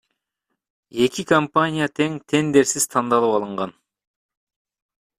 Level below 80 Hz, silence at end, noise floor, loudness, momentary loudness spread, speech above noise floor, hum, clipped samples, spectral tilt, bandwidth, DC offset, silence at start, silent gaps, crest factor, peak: -62 dBFS; 1.5 s; -79 dBFS; -20 LUFS; 11 LU; 59 dB; none; under 0.1%; -4 dB/octave; 15 kHz; under 0.1%; 0.95 s; none; 20 dB; -2 dBFS